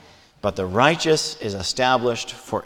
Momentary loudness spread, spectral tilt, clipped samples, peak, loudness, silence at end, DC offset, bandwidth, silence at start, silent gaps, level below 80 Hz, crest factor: 10 LU; -3.5 dB/octave; under 0.1%; -2 dBFS; -21 LUFS; 0 s; under 0.1%; 18 kHz; 0.45 s; none; -52 dBFS; 20 dB